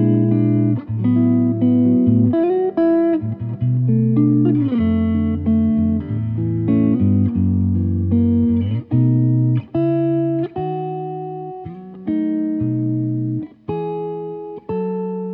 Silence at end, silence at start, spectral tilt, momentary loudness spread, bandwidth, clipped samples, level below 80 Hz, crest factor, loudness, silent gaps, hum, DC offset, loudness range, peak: 0 s; 0 s; -13.5 dB/octave; 11 LU; 4 kHz; under 0.1%; -50 dBFS; 14 dB; -18 LUFS; none; none; under 0.1%; 7 LU; -4 dBFS